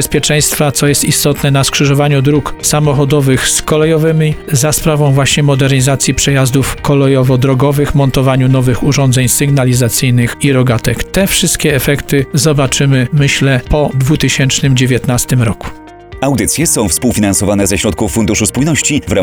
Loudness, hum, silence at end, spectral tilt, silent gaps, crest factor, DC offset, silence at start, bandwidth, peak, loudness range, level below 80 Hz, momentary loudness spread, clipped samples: -10 LUFS; none; 0 s; -4.5 dB/octave; none; 10 dB; under 0.1%; 0 s; 19.5 kHz; 0 dBFS; 2 LU; -28 dBFS; 3 LU; under 0.1%